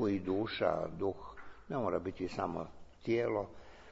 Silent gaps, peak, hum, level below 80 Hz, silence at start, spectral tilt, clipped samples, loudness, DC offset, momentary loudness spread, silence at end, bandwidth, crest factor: none; -16 dBFS; none; -60 dBFS; 0 s; -5.5 dB/octave; under 0.1%; -37 LUFS; under 0.1%; 16 LU; 0 s; 7.6 kHz; 20 dB